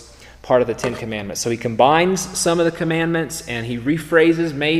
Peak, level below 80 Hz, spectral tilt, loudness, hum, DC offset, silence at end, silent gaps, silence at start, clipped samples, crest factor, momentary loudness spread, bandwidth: 0 dBFS; -46 dBFS; -4.5 dB/octave; -19 LUFS; none; 0.1%; 0 s; none; 0 s; under 0.1%; 18 dB; 10 LU; 15.5 kHz